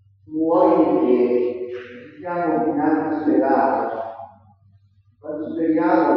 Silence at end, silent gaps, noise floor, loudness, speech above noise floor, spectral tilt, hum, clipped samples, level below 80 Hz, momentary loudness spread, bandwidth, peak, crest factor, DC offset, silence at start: 0 s; none; -56 dBFS; -20 LUFS; 38 dB; -6.5 dB/octave; none; under 0.1%; -68 dBFS; 17 LU; 5.4 kHz; -4 dBFS; 18 dB; under 0.1%; 0.3 s